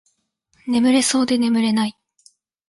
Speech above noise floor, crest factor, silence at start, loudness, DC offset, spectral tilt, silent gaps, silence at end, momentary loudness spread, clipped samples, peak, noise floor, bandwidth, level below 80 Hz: 49 dB; 14 dB; 0.65 s; -18 LUFS; under 0.1%; -3.5 dB/octave; none; 0.8 s; 9 LU; under 0.1%; -6 dBFS; -66 dBFS; 11.5 kHz; -64 dBFS